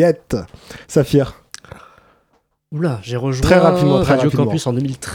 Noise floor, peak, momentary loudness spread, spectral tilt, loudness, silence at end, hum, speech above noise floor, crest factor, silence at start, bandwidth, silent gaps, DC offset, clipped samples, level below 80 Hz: -63 dBFS; 0 dBFS; 24 LU; -6.5 dB/octave; -16 LUFS; 0 s; none; 47 dB; 16 dB; 0 s; 16.5 kHz; none; under 0.1%; under 0.1%; -36 dBFS